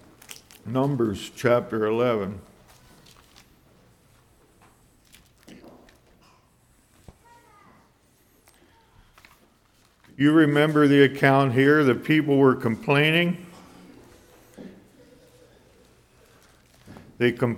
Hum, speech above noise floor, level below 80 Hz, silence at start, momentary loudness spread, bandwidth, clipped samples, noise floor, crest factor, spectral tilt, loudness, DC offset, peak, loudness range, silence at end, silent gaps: none; 41 dB; -62 dBFS; 0.65 s; 24 LU; 16 kHz; under 0.1%; -61 dBFS; 22 dB; -7 dB/octave; -21 LUFS; under 0.1%; -4 dBFS; 13 LU; 0 s; none